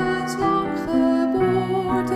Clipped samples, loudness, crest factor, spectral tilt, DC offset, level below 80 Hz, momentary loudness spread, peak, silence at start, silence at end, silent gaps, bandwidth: under 0.1%; -21 LUFS; 12 dB; -6.5 dB/octave; under 0.1%; -46 dBFS; 3 LU; -8 dBFS; 0 s; 0 s; none; 14.5 kHz